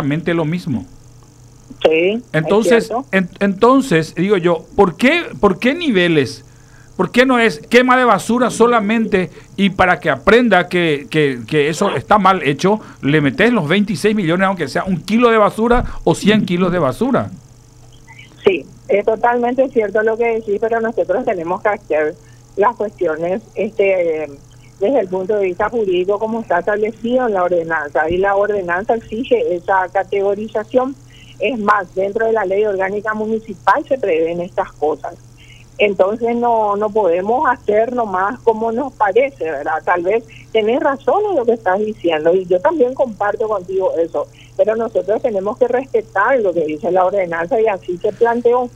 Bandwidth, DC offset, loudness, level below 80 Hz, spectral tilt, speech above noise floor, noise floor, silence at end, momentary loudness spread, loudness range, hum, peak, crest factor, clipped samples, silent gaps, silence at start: 14.5 kHz; under 0.1%; -16 LUFS; -42 dBFS; -6 dB/octave; 27 dB; -42 dBFS; 0.05 s; 7 LU; 4 LU; none; 0 dBFS; 16 dB; under 0.1%; none; 0 s